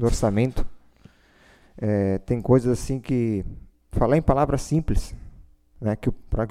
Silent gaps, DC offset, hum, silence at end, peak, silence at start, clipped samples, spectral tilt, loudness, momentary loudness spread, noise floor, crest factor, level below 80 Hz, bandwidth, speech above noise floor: none; under 0.1%; none; 0 s; -4 dBFS; 0 s; under 0.1%; -7.5 dB/octave; -24 LUFS; 13 LU; -55 dBFS; 20 dB; -32 dBFS; 14.5 kHz; 33 dB